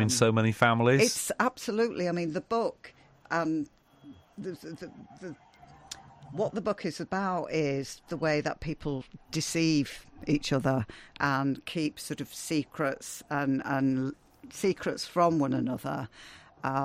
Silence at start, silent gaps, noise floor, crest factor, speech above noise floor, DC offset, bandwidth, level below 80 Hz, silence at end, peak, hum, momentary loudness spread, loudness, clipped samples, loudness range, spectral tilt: 0 s; none; -53 dBFS; 22 dB; 24 dB; under 0.1%; 16 kHz; -58 dBFS; 0 s; -8 dBFS; none; 18 LU; -30 LUFS; under 0.1%; 9 LU; -5 dB/octave